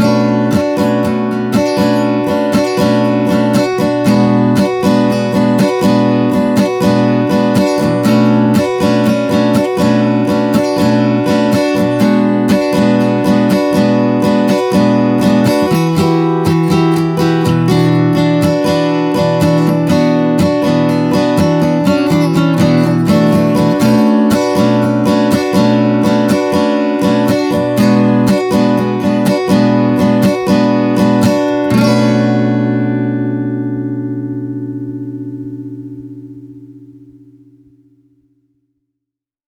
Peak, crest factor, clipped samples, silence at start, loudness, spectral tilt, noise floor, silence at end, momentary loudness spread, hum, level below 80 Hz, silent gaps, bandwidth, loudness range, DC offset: 0 dBFS; 10 dB; under 0.1%; 0 s; -12 LUFS; -7 dB/octave; -80 dBFS; 2.55 s; 4 LU; none; -46 dBFS; none; 19.5 kHz; 4 LU; under 0.1%